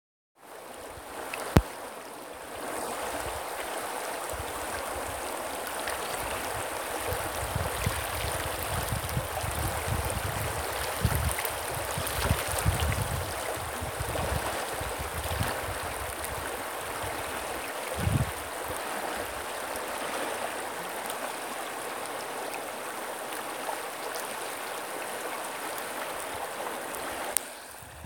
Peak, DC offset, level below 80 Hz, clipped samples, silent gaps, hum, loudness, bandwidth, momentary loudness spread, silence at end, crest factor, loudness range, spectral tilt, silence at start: 0 dBFS; under 0.1%; -44 dBFS; under 0.1%; none; none; -32 LUFS; 17 kHz; 6 LU; 0 s; 32 dB; 5 LU; -3.5 dB/octave; 0.4 s